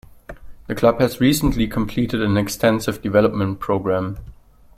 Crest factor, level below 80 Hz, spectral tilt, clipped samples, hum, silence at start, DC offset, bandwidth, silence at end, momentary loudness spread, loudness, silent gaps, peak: 18 dB; -38 dBFS; -6 dB/octave; under 0.1%; none; 0.3 s; under 0.1%; 16.5 kHz; 0.45 s; 7 LU; -19 LUFS; none; -2 dBFS